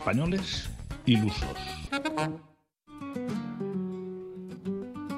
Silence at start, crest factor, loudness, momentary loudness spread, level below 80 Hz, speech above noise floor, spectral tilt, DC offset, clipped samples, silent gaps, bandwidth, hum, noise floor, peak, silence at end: 0 s; 22 dB; -32 LUFS; 14 LU; -46 dBFS; 24 dB; -6 dB/octave; under 0.1%; under 0.1%; none; 14.5 kHz; none; -52 dBFS; -10 dBFS; 0 s